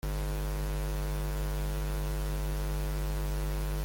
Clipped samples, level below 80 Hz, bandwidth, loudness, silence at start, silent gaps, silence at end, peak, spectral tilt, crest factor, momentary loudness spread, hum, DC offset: under 0.1%; -34 dBFS; 17 kHz; -35 LUFS; 0.05 s; none; 0 s; -24 dBFS; -5.5 dB/octave; 8 dB; 0 LU; none; under 0.1%